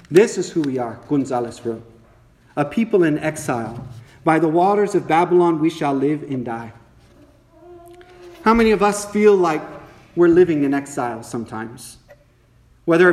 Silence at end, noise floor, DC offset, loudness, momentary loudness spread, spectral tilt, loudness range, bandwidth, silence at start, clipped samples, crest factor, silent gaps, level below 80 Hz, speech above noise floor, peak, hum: 0 s; -54 dBFS; under 0.1%; -18 LUFS; 16 LU; -6 dB/octave; 5 LU; 13.5 kHz; 0.1 s; under 0.1%; 18 dB; none; -50 dBFS; 36 dB; 0 dBFS; none